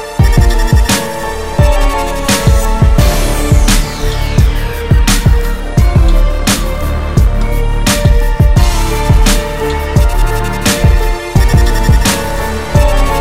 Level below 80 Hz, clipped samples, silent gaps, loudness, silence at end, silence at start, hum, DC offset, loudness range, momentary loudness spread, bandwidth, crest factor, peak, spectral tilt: -12 dBFS; 0.3%; none; -12 LUFS; 0 s; 0 s; none; under 0.1%; 1 LU; 6 LU; 16.5 kHz; 10 dB; 0 dBFS; -5 dB/octave